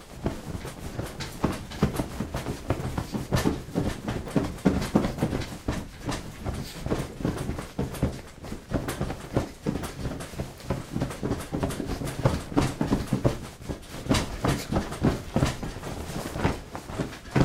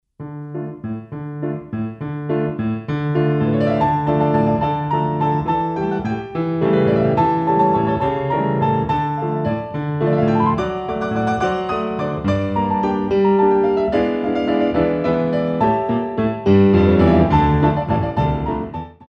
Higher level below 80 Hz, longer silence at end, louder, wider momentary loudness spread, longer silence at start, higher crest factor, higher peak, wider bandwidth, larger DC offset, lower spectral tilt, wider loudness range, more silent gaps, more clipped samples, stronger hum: about the same, -40 dBFS vs -38 dBFS; about the same, 0 s vs 0.05 s; second, -30 LUFS vs -18 LUFS; about the same, 10 LU vs 11 LU; second, 0 s vs 0.2 s; first, 24 dB vs 16 dB; second, -6 dBFS vs -2 dBFS; first, 16 kHz vs 6.6 kHz; neither; second, -6 dB/octave vs -9 dB/octave; about the same, 4 LU vs 4 LU; neither; neither; neither